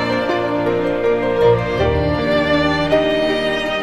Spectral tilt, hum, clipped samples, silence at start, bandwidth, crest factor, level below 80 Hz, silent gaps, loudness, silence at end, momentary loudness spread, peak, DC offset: -6.5 dB/octave; none; under 0.1%; 0 s; 13 kHz; 14 dB; -34 dBFS; none; -17 LUFS; 0 s; 3 LU; -2 dBFS; under 0.1%